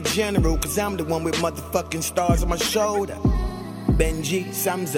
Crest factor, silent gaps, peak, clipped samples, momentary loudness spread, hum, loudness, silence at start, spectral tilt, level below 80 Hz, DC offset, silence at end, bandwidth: 18 dB; none; -4 dBFS; under 0.1%; 4 LU; none; -23 LUFS; 0 s; -4.5 dB/octave; -30 dBFS; under 0.1%; 0 s; 17 kHz